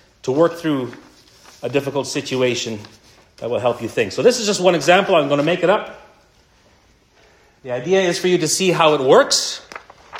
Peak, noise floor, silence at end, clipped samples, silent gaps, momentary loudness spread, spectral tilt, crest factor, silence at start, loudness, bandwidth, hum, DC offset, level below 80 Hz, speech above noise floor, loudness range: 0 dBFS; -54 dBFS; 0 s; under 0.1%; none; 17 LU; -3.5 dB/octave; 18 dB; 0.25 s; -17 LUFS; 16 kHz; none; under 0.1%; -60 dBFS; 37 dB; 5 LU